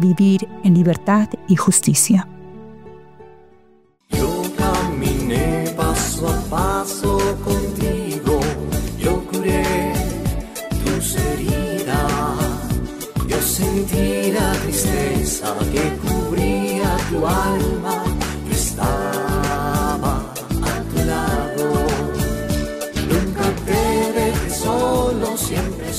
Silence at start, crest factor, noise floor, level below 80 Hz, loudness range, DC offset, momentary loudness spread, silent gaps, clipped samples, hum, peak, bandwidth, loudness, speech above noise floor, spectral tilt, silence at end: 0 s; 16 dB; -54 dBFS; -28 dBFS; 2 LU; under 0.1%; 7 LU; none; under 0.1%; none; -2 dBFS; 16 kHz; -19 LUFS; 37 dB; -5 dB/octave; 0 s